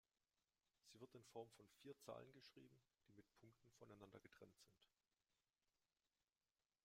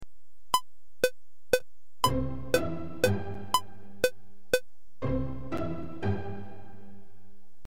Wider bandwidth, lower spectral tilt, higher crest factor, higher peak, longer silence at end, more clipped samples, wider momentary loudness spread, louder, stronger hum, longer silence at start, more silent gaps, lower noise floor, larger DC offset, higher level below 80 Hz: about the same, 15.5 kHz vs 16.5 kHz; about the same, -5 dB/octave vs -4.5 dB/octave; about the same, 26 dB vs 22 dB; second, -42 dBFS vs -10 dBFS; first, 1.5 s vs 0.65 s; neither; about the same, 8 LU vs 9 LU; second, -64 LUFS vs -31 LUFS; neither; first, 0.85 s vs 0 s; neither; first, under -90 dBFS vs -68 dBFS; second, under 0.1% vs 2%; second, under -90 dBFS vs -48 dBFS